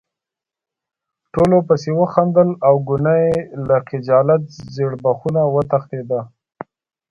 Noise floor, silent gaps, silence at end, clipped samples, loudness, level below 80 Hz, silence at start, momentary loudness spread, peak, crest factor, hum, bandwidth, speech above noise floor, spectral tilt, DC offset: -87 dBFS; none; 0.85 s; under 0.1%; -17 LUFS; -50 dBFS; 1.35 s; 12 LU; 0 dBFS; 18 dB; none; 8.2 kHz; 71 dB; -9 dB/octave; under 0.1%